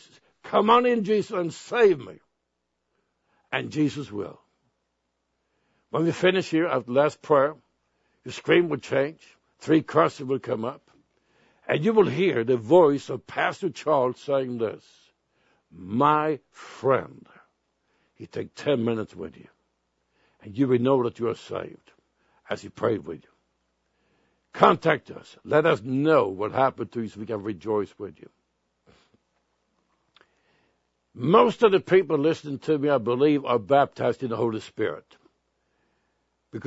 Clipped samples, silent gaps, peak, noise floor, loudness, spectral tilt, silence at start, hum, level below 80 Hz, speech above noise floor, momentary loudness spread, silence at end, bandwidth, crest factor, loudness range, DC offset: under 0.1%; none; -2 dBFS; -78 dBFS; -24 LUFS; -6.5 dB/octave; 0.45 s; none; -70 dBFS; 55 dB; 17 LU; 0.05 s; 8 kHz; 24 dB; 10 LU; under 0.1%